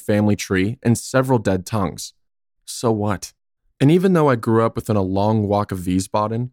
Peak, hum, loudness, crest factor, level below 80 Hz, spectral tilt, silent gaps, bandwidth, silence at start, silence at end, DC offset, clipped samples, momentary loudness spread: -4 dBFS; none; -19 LUFS; 14 dB; -50 dBFS; -6.5 dB/octave; none; 17 kHz; 0 s; 0.05 s; under 0.1%; under 0.1%; 9 LU